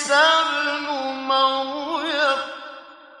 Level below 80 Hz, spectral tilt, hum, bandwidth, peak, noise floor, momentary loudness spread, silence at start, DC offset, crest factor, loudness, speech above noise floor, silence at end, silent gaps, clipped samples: -72 dBFS; -0.5 dB/octave; none; 11.5 kHz; -4 dBFS; -42 dBFS; 18 LU; 0 s; under 0.1%; 18 dB; -20 LUFS; 23 dB; 0.25 s; none; under 0.1%